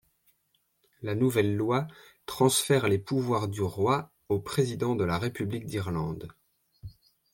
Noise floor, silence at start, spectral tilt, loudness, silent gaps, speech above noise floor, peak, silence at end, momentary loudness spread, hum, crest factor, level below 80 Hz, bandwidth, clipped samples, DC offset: -73 dBFS; 1 s; -5.5 dB/octave; -28 LUFS; none; 46 dB; -10 dBFS; 0.45 s; 17 LU; none; 20 dB; -60 dBFS; 17 kHz; under 0.1%; under 0.1%